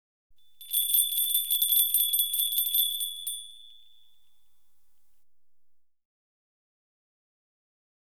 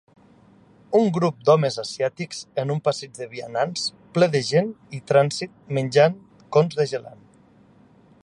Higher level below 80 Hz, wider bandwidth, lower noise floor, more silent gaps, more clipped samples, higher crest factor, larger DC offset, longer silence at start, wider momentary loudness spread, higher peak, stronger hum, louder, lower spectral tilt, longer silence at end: second, -84 dBFS vs -66 dBFS; first, over 20 kHz vs 11.5 kHz; first, -85 dBFS vs -54 dBFS; neither; neither; about the same, 22 dB vs 20 dB; first, 0.3% vs under 0.1%; second, 0.6 s vs 0.9 s; about the same, 10 LU vs 12 LU; second, -10 dBFS vs -4 dBFS; neither; about the same, -24 LUFS vs -22 LUFS; second, 6.5 dB/octave vs -5.5 dB/octave; first, 4.4 s vs 1.15 s